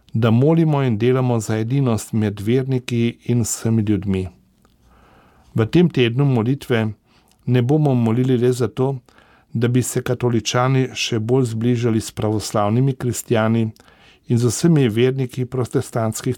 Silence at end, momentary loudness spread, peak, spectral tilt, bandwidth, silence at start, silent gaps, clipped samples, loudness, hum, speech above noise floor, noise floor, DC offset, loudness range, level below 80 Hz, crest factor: 0 s; 7 LU; -4 dBFS; -6.5 dB/octave; 17.5 kHz; 0.15 s; none; under 0.1%; -19 LUFS; none; 37 dB; -55 dBFS; under 0.1%; 2 LU; -52 dBFS; 14 dB